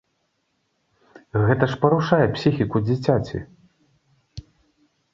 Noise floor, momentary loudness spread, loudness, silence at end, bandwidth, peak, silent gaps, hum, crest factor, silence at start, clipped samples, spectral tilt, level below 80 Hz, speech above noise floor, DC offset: -71 dBFS; 24 LU; -21 LUFS; 0.75 s; 7.6 kHz; -2 dBFS; none; none; 22 dB; 1.35 s; under 0.1%; -8 dB/octave; -48 dBFS; 52 dB; under 0.1%